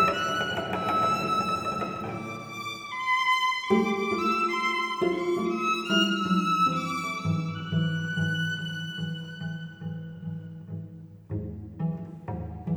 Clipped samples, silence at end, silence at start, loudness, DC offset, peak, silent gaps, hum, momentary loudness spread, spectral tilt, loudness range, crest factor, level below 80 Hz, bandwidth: under 0.1%; 0 s; 0 s; -28 LUFS; under 0.1%; -10 dBFS; none; none; 14 LU; -5 dB/octave; 11 LU; 18 dB; -56 dBFS; 19.5 kHz